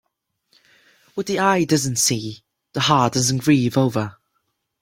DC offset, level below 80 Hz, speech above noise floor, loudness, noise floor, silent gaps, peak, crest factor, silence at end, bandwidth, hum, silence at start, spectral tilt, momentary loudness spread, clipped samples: under 0.1%; -56 dBFS; 55 dB; -19 LUFS; -74 dBFS; none; -2 dBFS; 20 dB; 0.7 s; 16.5 kHz; none; 1.15 s; -4 dB/octave; 14 LU; under 0.1%